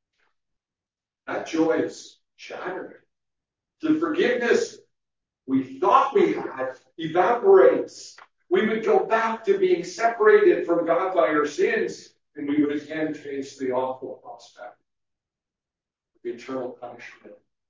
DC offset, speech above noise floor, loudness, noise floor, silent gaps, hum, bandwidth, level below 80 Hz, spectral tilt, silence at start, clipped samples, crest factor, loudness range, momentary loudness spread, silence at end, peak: under 0.1%; over 67 dB; -22 LUFS; under -90 dBFS; none; none; 7.8 kHz; -78 dBFS; -5 dB/octave; 1.25 s; under 0.1%; 20 dB; 13 LU; 22 LU; 0.35 s; -4 dBFS